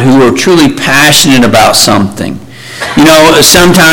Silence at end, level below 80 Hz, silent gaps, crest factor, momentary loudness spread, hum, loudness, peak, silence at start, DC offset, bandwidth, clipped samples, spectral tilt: 0 s; -30 dBFS; none; 4 dB; 16 LU; none; -4 LUFS; 0 dBFS; 0 s; under 0.1%; over 20 kHz; 3%; -3.5 dB/octave